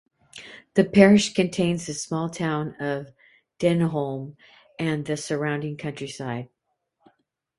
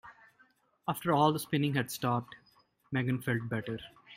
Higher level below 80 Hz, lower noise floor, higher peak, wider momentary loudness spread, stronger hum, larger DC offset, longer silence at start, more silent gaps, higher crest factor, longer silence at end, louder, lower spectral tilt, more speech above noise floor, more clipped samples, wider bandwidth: first, -60 dBFS vs -70 dBFS; first, -75 dBFS vs -68 dBFS; first, 0 dBFS vs -12 dBFS; first, 18 LU vs 13 LU; neither; neither; first, 0.35 s vs 0.05 s; neither; about the same, 24 dB vs 20 dB; first, 1.15 s vs 0 s; first, -24 LUFS vs -32 LUFS; about the same, -5.5 dB/octave vs -6 dB/octave; first, 52 dB vs 36 dB; neither; second, 11.5 kHz vs 16 kHz